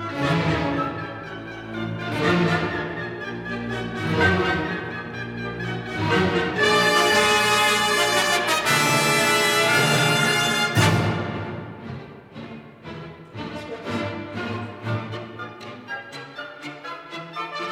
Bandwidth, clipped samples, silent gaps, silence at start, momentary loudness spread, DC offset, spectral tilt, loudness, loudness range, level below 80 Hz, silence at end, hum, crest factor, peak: 18 kHz; under 0.1%; none; 0 s; 18 LU; under 0.1%; -3.5 dB/octave; -21 LUFS; 14 LU; -50 dBFS; 0 s; none; 18 dB; -6 dBFS